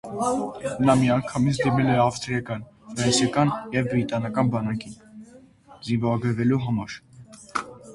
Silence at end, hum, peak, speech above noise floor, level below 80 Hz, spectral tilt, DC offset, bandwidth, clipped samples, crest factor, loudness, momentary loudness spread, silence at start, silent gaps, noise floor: 0 s; none; -6 dBFS; 27 dB; -52 dBFS; -5.5 dB/octave; under 0.1%; 11.5 kHz; under 0.1%; 18 dB; -24 LUFS; 14 LU; 0.05 s; none; -50 dBFS